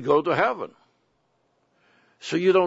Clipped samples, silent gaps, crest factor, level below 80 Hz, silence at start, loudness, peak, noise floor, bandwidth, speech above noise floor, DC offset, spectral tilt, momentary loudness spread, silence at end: under 0.1%; none; 18 dB; -70 dBFS; 0 s; -23 LUFS; -6 dBFS; -69 dBFS; 8 kHz; 47 dB; under 0.1%; -6 dB/octave; 18 LU; 0 s